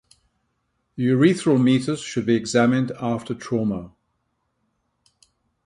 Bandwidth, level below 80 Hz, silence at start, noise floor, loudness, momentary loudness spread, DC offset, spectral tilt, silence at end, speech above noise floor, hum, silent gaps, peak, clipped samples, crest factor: 11.5 kHz; -58 dBFS; 0.95 s; -73 dBFS; -21 LUFS; 9 LU; under 0.1%; -6 dB/octave; 1.75 s; 53 dB; none; none; -4 dBFS; under 0.1%; 18 dB